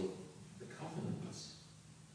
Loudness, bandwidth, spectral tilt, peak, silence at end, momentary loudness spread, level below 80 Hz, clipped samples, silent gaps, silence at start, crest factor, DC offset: -48 LUFS; 10.5 kHz; -5.5 dB/octave; -30 dBFS; 0 s; 13 LU; -74 dBFS; under 0.1%; none; 0 s; 18 dB; under 0.1%